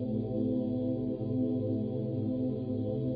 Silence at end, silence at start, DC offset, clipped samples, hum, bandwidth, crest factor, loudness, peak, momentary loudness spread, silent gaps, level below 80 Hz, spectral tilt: 0 s; 0 s; under 0.1%; under 0.1%; none; 4.8 kHz; 12 dB; -33 LUFS; -20 dBFS; 2 LU; none; -58 dBFS; -12 dB/octave